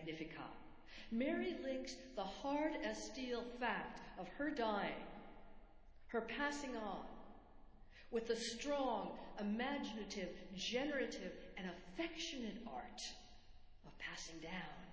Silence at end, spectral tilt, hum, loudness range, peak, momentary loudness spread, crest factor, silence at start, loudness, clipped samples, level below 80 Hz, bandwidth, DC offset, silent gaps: 0 s; -4 dB/octave; none; 5 LU; -26 dBFS; 17 LU; 20 dB; 0 s; -45 LUFS; under 0.1%; -64 dBFS; 8 kHz; under 0.1%; none